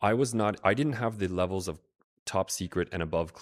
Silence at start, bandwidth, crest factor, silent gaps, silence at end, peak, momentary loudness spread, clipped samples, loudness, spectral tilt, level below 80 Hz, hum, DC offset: 0 s; 16 kHz; 22 dB; 2.04-2.26 s; 0 s; -8 dBFS; 9 LU; under 0.1%; -30 LUFS; -5 dB/octave; -58 dBFS; none; under 0.1%